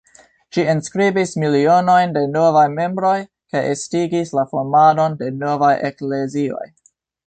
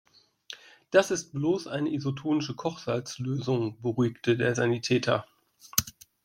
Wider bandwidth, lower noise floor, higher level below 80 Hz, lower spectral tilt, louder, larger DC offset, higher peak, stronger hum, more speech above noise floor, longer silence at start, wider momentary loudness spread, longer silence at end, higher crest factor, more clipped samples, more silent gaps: second, 9.2 kHz vs 16.5 kHz; about the same, -51 dBFS vs -49 dBFS; about the same, -60 dBFS vs -62 dBFS; about the same, -6 dB/octave vs -5 dB/octave; first, -17 LUFS vs -28 LUFS; neither; about the same, -2 dBFS vs -2 dBFS; neither; first, 34 dB vs 21 dB; about the same, 0.55 s vs 0.5 s; about the same, 10 LU vs 8 LU; first, 0.6 s vs 0.35 s; second, 14 dB vs 26 dB; neither; neither